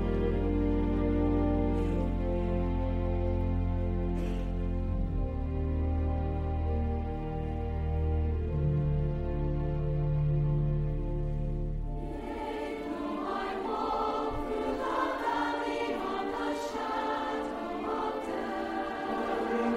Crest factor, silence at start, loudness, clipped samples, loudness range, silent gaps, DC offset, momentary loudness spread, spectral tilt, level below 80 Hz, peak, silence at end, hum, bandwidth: 14 dB; 0 s; -32 LUFS; under 0.1%; 3 LU; none; under 0.1%; 6 LU; -8 dB/octave; -36 dBFS; -16 dBFS; 0 s; none; 9 kHz